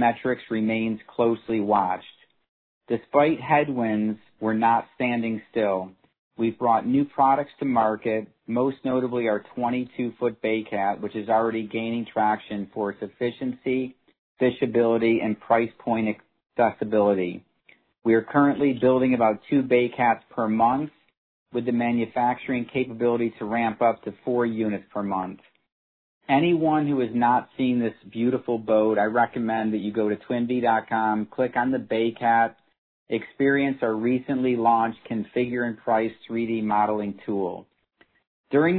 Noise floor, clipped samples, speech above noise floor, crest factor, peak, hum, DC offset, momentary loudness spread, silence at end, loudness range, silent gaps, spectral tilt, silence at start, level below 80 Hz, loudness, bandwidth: -63 dBFS; under 0.1%; 40 dB; 18 dB; -6 dBFS; none; under 0.1%; 9 LU; 0 s; 4 LU; 2.48-2.81 s, 6.19-6.31 s, 14.19-14.35 s, 21.17-21.46 s, 25.72-26.21 s, 32.78-33.06 s, 38.27-38.44 s; -10.5 dB/octave; 0 s; -64 dBFS; -24 LUFS; 4.4 kHz